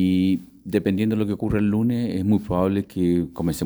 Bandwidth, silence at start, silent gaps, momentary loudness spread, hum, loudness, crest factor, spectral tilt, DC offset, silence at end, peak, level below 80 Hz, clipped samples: over 20 kHz; 0 s; none; 3 LU; none; -23 LUFS; 16 dB; -7.5 dB/octave; under 0.1%; 0 s; -6 dBFS; -46 dBFS; under 0.1%